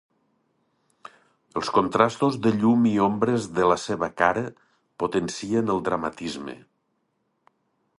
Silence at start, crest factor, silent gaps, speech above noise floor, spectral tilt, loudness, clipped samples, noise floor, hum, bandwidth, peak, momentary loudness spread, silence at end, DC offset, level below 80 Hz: 1.55 s; 22 dB; none; 50 dB; -6 dB/octave; -24 LUFS; under 0.1%; -73 dBFS; none; 11.5 kHz; -2 dBFS; 13 LU; 1.4 s; under 0.1%; -58 dBFS